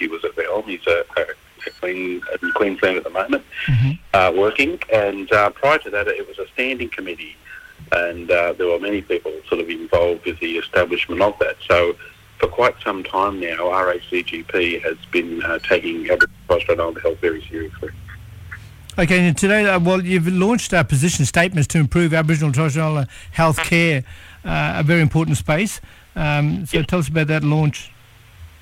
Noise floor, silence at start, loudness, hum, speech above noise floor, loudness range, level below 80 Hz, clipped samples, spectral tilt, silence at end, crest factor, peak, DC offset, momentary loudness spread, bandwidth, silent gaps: -44 dBFS; 0 s; -19 LUFS; none; 25 dB; 4 LU; -40 dBFS; under 0.1%; -5.5 dB/octave; 0.15 s; 16 dB; -4 dBFS; under 0.1%; 12 LU; 16 kHz; none